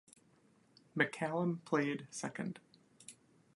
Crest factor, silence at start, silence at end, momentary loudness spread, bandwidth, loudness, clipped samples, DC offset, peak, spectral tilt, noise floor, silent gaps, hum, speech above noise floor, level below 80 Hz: 26 dB; 0.95 s; 0.45 s; 21 LU; 11.5 kHz; -38 LUFS; under 0.1%; under 0.1%; -14 dBFS; -5.5 dB/octave; -69 dBFS; none; none; 32 dB; -84 dBFS